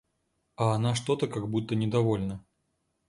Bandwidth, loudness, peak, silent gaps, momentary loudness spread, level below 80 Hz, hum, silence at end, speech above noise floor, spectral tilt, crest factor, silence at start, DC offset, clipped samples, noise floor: 11.5 kHz; -29 LUFS; -12 dBFS; none; 5 LU; -58 dBFS; none; 0.7 s; 49 dB; -6.5 dB/octave; 18 dB; 0.6 s; under 0.1%; under 0.1%; -77 dBFS